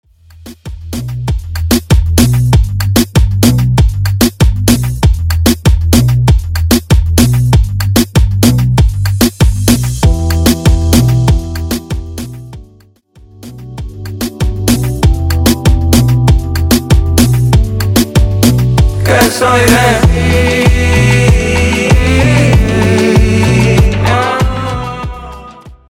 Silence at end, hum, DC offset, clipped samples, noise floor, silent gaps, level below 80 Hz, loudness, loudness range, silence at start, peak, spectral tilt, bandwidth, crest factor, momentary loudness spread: 0.25 s; none; under 0.1%; under 0.1%; -44 dBFS; none; -16 dBFS; -10 LUFS; 6 LU; 0.45 s; 0 dBFS; -5.5 dB/octave; 19.5 kHz; 10 dB; 12 LU